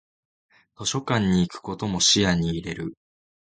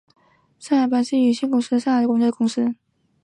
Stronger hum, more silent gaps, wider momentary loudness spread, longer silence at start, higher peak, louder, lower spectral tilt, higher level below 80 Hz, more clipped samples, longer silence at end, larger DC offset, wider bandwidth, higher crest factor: neither; neither; first, 14 LU vs 5 LU; first, 0.8 s vs 0.6 s; about the same, -6 dBFS vs -8 dBFS; second, -23 LUFS vs -20 LUFS; second, -3.5 dB/octave vs -5 dB/octave; first, -46 dBFS vs -72 dBFS; neither; about the same, 0.55 s vs 0.5 s; neither; second, 9.4 kHz vs 10.5 kHz; first, 20 dB vs 12 dB